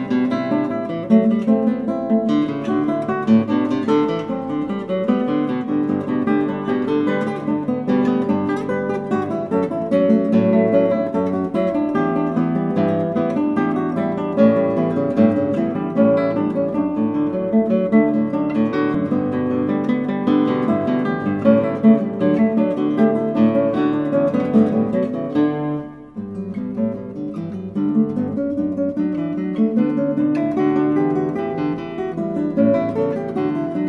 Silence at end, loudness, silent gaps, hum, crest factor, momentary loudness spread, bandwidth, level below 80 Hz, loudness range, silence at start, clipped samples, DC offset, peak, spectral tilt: 0 s; -19 LUFS; none; none; 16 dB; 7 LU; 6 kHz; -54 dBFS; 3 LU; 0 s; under 0.1%; under 0.1%; -2 dBFS; -9 dB/octave